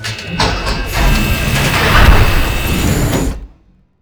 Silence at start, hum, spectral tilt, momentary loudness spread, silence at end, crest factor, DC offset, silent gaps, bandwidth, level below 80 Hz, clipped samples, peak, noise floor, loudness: 0 s; none; -4.5 dB/octave; 9 LU; 0.55 s; 12 dB; under 0.1%; none; over 20 kHz; -16 dBFS; 0.2%; 0 dBFS; -48 dBFS; -13 LUFS